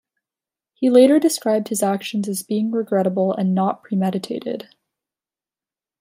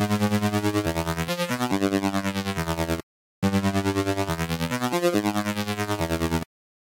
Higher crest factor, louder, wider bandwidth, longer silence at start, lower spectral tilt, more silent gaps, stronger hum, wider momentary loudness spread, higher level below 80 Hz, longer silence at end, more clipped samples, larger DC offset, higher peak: about the same, 18 dB vs 14 dB; first, -19 LUFS vs -25 LUFS; about the same, 16 kHz vs 17 kHz; first, 0.8 s vs 0 s; about the same, -5.5 dB/octave vs -5.5 dB/octave; second, none vs 3.03-3.42 s; neither; first, 12 LU vs 5 LU; second, -72 dBFS vs -44 dBFS; first, 1.4 s vs 0.4 s; neither; neither; first, -2 dBFS vs -10 dBFS